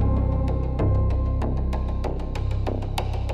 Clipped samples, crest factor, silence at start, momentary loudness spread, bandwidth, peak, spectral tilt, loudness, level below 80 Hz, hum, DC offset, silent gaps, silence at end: under 0.1%; 12 dB; 0 s; 5 LU; 11.5 kHz; -10 dBFS; -8 dB/octave; -26 LUFS; -26 dBFS; none; under 0.1%; none; 0 s